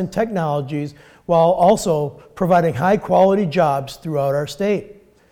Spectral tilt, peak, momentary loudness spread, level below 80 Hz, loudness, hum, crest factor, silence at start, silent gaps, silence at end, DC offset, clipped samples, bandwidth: -6.5 dB/octave; -4 dBFS; 11 LU; -50 dBFS; -18 LUFS; none; 14 dB; 0 s; none; 0.4 s; under 0.1%; under 0.1%; 17 kHz